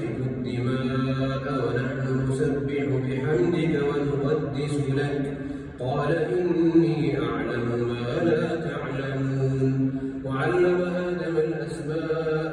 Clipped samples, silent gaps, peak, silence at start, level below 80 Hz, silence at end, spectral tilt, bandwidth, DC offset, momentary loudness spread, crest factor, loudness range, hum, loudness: under 0.1%; none; -8 dBFS; 0 s; -50 dBFS; 0 s; -8 dB/octave; 11 kHz; under 0.1%; 7 LU; 16 dB; 1 LU; none; -25 LUFS